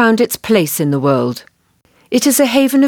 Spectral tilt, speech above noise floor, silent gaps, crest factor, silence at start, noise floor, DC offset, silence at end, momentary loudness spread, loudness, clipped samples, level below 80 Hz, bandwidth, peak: -4.5 dB/octave; 43 dB; none; 14 dB; 0 s; -56 dBFS; under 0.1%; 0 s; 7 LU; -14 LUFS; under 0.1%; -58 dBFS; 19.5 kHz; 0 dBFS